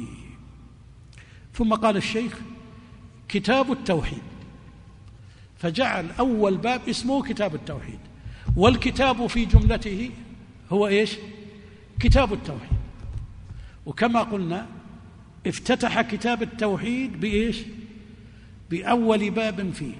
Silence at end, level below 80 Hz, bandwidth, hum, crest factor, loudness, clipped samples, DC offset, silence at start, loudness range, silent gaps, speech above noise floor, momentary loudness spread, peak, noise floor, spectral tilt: 0 s; -34 dBFS; 10.5 kHz; none; 24 dB; -24 LUFS; under 0.1%; under 0.1%; 0 s; 5 LU; none; 24 dB; 22 LU; -2 dBFS; -47 dBFS; -6 dB/octave